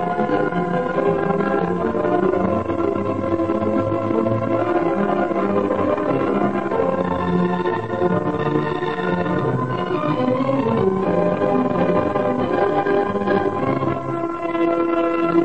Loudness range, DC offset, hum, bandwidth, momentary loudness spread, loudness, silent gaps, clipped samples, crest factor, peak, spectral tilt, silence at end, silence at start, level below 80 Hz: 2 LU; 0.9%; none; 8.4 kHz; 3 LU; -20 LUFS; none; under 0.1%; 14 dB; -6 dBFS; -8.5 dB/octave; 0 s; 0 s; -50 dBFS